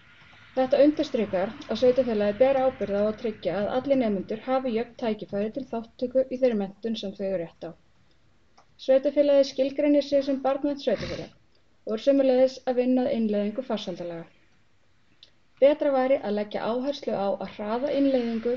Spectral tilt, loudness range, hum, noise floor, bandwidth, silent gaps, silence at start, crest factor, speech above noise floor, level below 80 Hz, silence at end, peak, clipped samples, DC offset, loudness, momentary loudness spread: -5 dB/octave; 4 LU; none; -67 dBFS; 7 kHz; none; 0.55 s; 16 dB; 42 dB; -60 dBFS; 0 s; -8 dBFS; under 0.1%; 0.2%; -25 LUFS; 11 LU